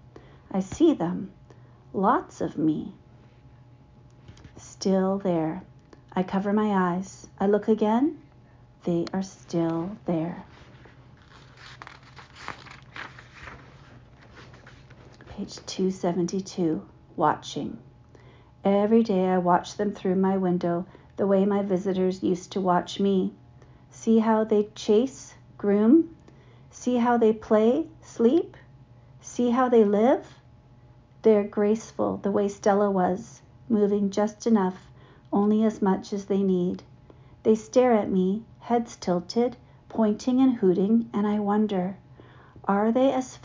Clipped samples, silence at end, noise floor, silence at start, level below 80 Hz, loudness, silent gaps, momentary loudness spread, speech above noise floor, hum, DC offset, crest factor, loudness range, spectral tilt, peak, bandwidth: under 0.1%; 0.05 s; -53 dBFS; 0.5 s; -58 dBFS; -25 LUFS; none; 18 LU; 29 dB; none; under 0.1%; 18 dB; 9 LU; -7 dB/octave; -8 dBFS; 7.6 kHz